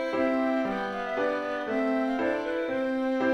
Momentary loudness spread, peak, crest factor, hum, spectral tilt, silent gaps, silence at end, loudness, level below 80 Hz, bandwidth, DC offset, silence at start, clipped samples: 4 LU; -14 dBFS; 14 dB; none; -6 dB/octave; none; 0 s; -28 LUFS; -60 dBFS; 8.6 kHz; under 0.1%; 0 s; under 0.1%